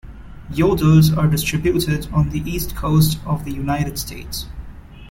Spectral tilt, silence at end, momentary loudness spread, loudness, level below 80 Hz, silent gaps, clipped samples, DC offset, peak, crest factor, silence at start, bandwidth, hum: -6 dB/octave; 0 s; 15 LU; -19 LUFS; -32 dBFS; none; under 0.1%; under 0.1%; -2 dBFS; 16 dB; 0.05 s; 17 kHz; none